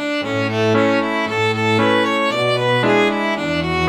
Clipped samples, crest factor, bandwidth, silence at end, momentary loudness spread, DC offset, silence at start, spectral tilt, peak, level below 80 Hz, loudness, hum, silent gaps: under 0.1%; 14 dB; 16 kHz; 0 s; 5 LU; under 0.1%; 0 s; -5.5 dB/octave; -4 dBFS; -46 dBFS; -17 LUFS; none; none